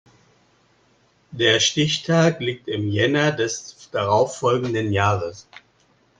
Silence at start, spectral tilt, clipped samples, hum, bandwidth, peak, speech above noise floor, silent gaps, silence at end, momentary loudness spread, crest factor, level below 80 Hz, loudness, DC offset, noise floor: 1.3 s; -4.5 dB/octave; under 0.1%; none; 9.8 kHz; -4 dBFS; 40 dB; none; 0.8 s; 10 LU; 18 dB; -60 dBFS; -20 LUFS; under 0.1%; -60 dBFS